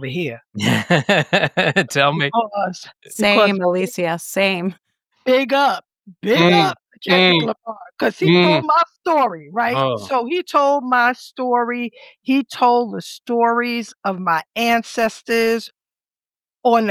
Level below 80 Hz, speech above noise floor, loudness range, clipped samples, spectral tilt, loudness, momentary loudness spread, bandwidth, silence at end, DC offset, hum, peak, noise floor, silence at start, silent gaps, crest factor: -62 dBFS; over 72 dB; 4 LU; under 0.1%; -5 dB/octave; -17 LUFS; 12 LU; 16 kHz; 0 s; under 0.1%; none; 0 dBFS; under -90 dBFS; 0 s; none; 18 dB